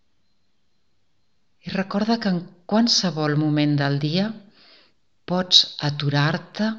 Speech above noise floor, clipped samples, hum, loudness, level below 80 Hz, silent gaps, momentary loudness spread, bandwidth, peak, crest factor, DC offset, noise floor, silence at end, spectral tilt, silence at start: 51 dB; under 0.1%; none; -21 LUFS; -66 dBFS; none; 13 LU; 7.6 kHz; 0 dBFS; 22 dB; 0.2%; -72 dBFS; 0 s; -4.5 dB/octave; 1.65 s